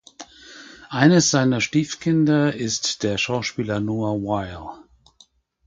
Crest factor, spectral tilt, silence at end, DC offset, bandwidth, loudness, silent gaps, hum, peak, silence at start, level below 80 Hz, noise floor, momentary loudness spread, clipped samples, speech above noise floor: 22 dB; -4.5 dB/octave; 0.9 s; under 0.1%; 9.4 kHz; -21 LUFS; none; none; 0 dBFS; 0.2 s; -52 dBFS; -57 dBFS; 24 LU; under 0.1%; 36 dB